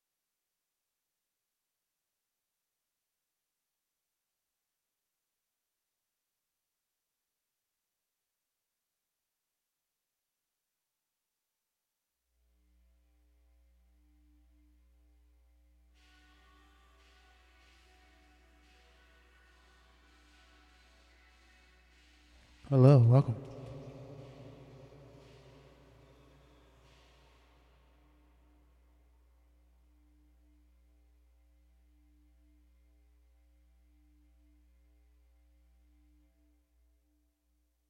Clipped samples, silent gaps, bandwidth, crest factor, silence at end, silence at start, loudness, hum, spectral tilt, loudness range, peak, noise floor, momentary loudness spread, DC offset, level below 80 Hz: under 0.1%; none; 6 kHz; 30 dB; 14.1 s; 22.7 s; -26 LUFS; none; -10 dB/octave; 26 LU; -10 dBFS; -88 dBFS; 35 LU; under 0.1%; -68 dBFS